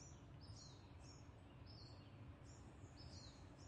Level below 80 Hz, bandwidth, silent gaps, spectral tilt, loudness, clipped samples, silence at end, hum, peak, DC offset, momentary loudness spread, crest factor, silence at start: -68 dBFS; 9.6 kHz; none; -5 dB/octave; -61 LUFS; under 0.1%; 0 s; none; -46 dBFS; under 0.1%; 3 LU; 14 dB; 0 s